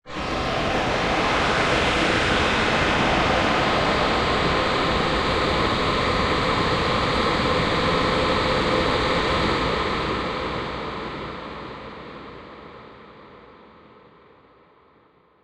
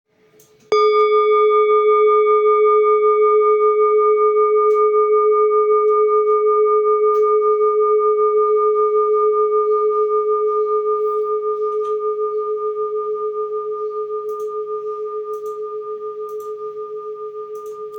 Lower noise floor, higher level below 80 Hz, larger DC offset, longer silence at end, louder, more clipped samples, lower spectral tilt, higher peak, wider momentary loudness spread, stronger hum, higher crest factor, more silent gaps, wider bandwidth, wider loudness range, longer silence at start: first, -57 dBFS vs -53 dBFS; first, -36 dBFS vs -74 dBFS; neither; first, 2 s vs 0 s; second, -21 LUFS vs -16 LUFS; neither; about the same, -4.5 dB/octave vs -4 dB/octave; about the same, -8 dBFS vs -6 dBFS; about the same, 15 LU vs 14 LU; neither; first, 16 dB vs 10 dB; neither; first, 13 kHz vs 5.2 kHz; about the same, 14 LU vs 12 LU; second, 0.05 s vs 0.7 s